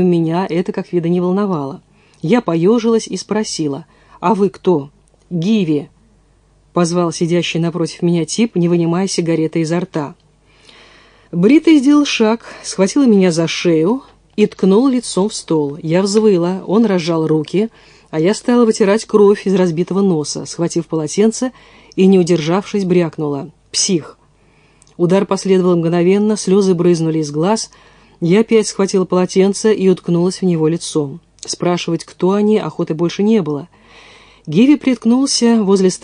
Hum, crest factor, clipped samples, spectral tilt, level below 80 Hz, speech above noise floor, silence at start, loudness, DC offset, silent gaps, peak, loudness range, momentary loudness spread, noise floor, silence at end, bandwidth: none; 14 dB; under 0.1%; -5.5 dB/octave; -56 dBFS; 38 dB; 0 s; -15 LUFS; under 0.1%; none; 0 dBFS; 4 LU; 10 LU; -52 dBFS; 0.05 s; 10.5 kHz